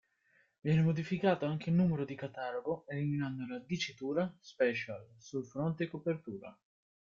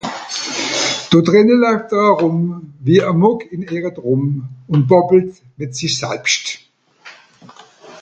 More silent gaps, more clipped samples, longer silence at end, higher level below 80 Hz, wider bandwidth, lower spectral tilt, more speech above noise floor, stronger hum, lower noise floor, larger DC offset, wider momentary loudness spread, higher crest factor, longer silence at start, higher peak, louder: neither; neither; first, 0.5 s vs 0 s; second, -70 dBFS vs -58 dBFS; second, 7.2 kHz vs 9.2 kHz; first, -7 dB/octave vs -5 dB/octave; first, 38 dB vs 28 dB; neither; first, -72 dBFS vs -43 dBFS; neither; about the same, 12 LU vs 13 LU; about the same, 18 dB vs 16 dB; first, 0.65 s vs 0.05 s; second, -16 dBFS vs 0 dBFS; second, -35 LUFS vs -15 LUFS